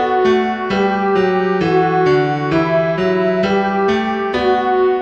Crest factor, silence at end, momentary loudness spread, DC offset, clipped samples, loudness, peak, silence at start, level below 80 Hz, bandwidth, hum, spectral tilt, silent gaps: 12 dB; 0 s; 3 LU; 0.2%; under 0.1%; -15 LUFS; -2 dBFS; 0 s; -46 dBFS; 7.2 kHz; none; -7 dB/octave; none